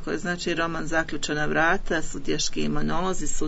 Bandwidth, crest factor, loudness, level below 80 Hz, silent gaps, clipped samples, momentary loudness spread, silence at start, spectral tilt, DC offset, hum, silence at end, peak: 8 kHz; 16 dB; -26 LUFS; -34 dBFS; none; under 0.1%; 6 LU; 0 s; -3.5 dB/octave; under 0.1%; none; 0 s; -8 dBFS